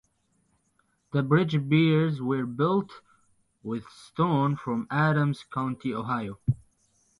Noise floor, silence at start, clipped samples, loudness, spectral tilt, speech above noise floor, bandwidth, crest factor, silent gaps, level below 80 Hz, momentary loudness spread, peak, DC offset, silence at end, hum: -71 dBFS; 1.15 s; under 0.1%; -27 LUFS; -8.5 dB/octave; 45 dB; 11 kHz; 20 dB; none; -60 dBFS; 13 LU; -8 dBFS; under 0.1%; 0.65 s; none